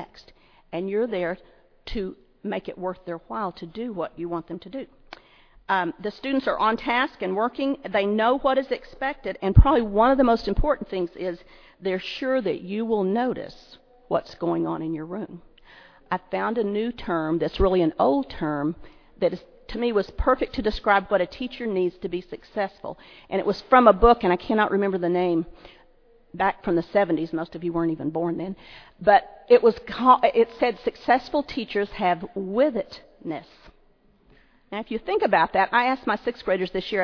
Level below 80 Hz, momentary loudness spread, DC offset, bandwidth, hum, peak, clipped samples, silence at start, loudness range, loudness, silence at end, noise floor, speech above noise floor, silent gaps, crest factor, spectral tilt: -36 dBFS; 16 LU; under 0.1%; 5.4 kHz; none; 0 dBFS; under 0.1%; 0 s; 9 LU; -24 LUFS; 0 s; -59 dBFS; 36 dB; none; 24 dB; -8 dB/octave